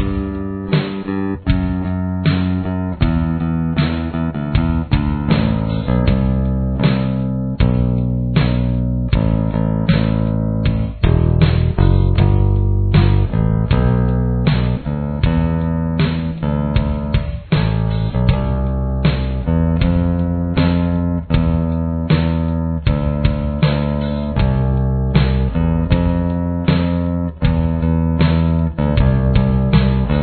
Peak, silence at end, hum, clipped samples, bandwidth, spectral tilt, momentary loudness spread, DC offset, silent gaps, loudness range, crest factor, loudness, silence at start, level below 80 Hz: 0 dBFS; 0 s; none; under 0.1%; 4.5 kHz; -11.5 dB/octave; 5 LU; under 0.1%; none; 3 LU; 16 dB; -17 LUFS; 0 s; -22 dBFS